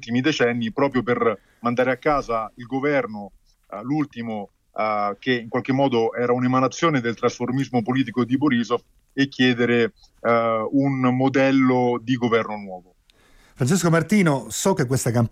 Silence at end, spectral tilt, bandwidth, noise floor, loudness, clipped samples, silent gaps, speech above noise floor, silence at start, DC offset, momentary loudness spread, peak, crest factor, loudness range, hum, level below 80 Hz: 0.05 s; -5.5 dB/octave; 15.5 kHz; -55 dBFS; -21 LUFS; under 0.1%; none; 34 dB; 0 s; under 0.1%; 10 LU; -8 dBFS; 14 dB; 5 LU; none; -54 dBFS